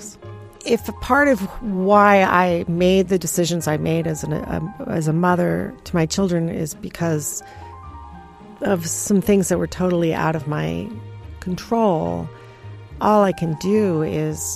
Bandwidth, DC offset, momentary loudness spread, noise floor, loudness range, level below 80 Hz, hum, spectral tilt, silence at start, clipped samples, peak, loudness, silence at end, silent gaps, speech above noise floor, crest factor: 15.5 kHz; under 0.1%; 20 LU; -40 dBFS; 6 LU; -44 dBFS; none; -5.5 dB/octave; 0 s; under 0.1%; -2 dBFS; -20 LUFS; 0 s; none; 21 dB; 18 dB